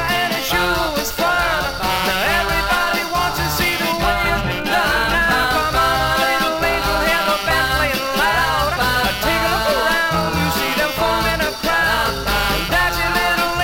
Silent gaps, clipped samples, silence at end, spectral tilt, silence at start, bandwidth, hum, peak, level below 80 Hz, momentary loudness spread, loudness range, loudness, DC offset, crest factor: none; under 0.1%; 0 s; -3 dB/octave; 0 s; 17 kHz; none; -4 dBFS; -32 dBFS; 3 LU; 1 LU; -17 LUFS; under 0.1%; 14 dB